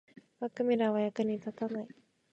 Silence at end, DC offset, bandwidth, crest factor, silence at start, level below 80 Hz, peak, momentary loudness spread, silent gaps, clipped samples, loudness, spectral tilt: 0.45 s; under 0.1%; 7.8 kHz; 16 dB; 0.4 s; -80 dBFS; -18 dBFS; 12 LU; none; under 0.1%; -33 LUFS; -7.5 dB/octave